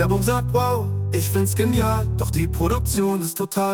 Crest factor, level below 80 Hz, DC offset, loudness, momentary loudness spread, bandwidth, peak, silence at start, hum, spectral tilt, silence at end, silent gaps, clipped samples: 14 dB; -32 dBFS; under 0.1%; -21 LUFS; 4 LU; 18 kHz; -6 dBFS; 0 s; none; -6 dB/octave; 0 s; none; under 0.1%